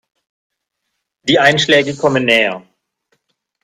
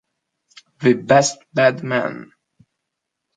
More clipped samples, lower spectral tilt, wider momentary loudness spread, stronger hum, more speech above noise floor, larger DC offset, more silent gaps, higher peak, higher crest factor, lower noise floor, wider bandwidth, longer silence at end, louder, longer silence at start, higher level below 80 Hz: neither; about the same, -4 dB/octave vs -4.5 dB/octave; about the same, 10 LU vs 10 LU; neither; about the same, 61 dB vs 62 dB; neither; neither; about the same, 0 dBFS vs -2 dBFS; about the same, 16 dB vs 20 dB; second, -74 dBFS vs -79 dBFS; first, 15 kHz vs 9.4 kHz; about the same, 1.05 s vs 1.15 s; first, -13 LUFS vs -18 LUFS; first, 1.25 s vs 0.8 s; first, -56 dBFS vs -64 dBFS